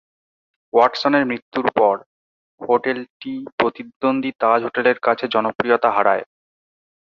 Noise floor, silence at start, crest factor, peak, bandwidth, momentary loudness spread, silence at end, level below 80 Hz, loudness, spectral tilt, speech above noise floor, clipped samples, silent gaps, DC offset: under -90 dBFS; 0.75 s; 18 dB; -2 dBFS; 7 kHz; 10 LU; 0.95 s; -64 dBFS; -19 LUFS; -6 dB/octave; over 71 dB; under 0.1%; 1.42-1.52 s, 2.06-2.58 s, 3.10-3.20 s, 3.52-3.58 s, 3.96-4.00 s, 5.55-5.59 s; under 0.1%